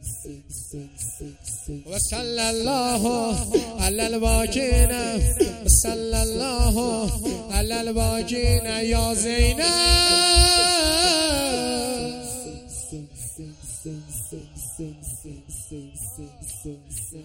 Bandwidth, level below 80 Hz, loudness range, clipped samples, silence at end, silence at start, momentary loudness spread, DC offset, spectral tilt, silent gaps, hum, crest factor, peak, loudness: 16.5 kHz; -28 dBFS; 17 LU; under 0.1%; 0 s; 0 s; 19 LU; under 0.1%; -3 dB/octave; none; none; 20 dB; -2 dBFS; -21 LUFS